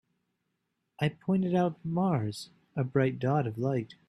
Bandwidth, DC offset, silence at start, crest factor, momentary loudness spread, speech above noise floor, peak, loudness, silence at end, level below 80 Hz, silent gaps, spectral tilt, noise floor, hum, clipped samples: 12.5 kHz; under 0.1%; 1 s; 18 dB; 8 LU; 52 dB; -14 dBFS; -30 LUFS; 0.15 s; -68 dBFS; none; -8 dB/octave; -81 dBFS; none; under 0.1%